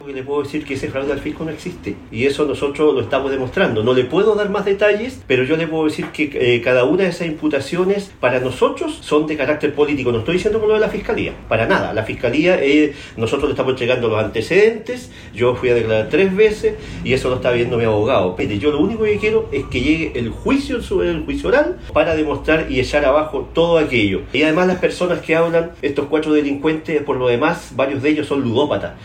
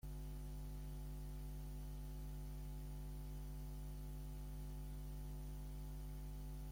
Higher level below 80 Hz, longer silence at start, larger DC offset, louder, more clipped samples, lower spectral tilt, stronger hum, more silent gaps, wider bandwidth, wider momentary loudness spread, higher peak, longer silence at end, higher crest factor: first, -38 dBFS vs -50 dBFS; about the same, 0 s vs 0.05 s; neither; first, -17 LUFS vs -52 LUFS; neither; about the same, -6 dB/octave vs -6.5 dB/octave; second, none vs 50 Hz at -50 dBFS; neither; second, 14 kHz vs 16.5 kHz; first, 7 LU vs 0 LU; first, -2 dBFS vs -42 dBFS; about the same, 0 s vs 0 s; first, 16 dB vs 8 dB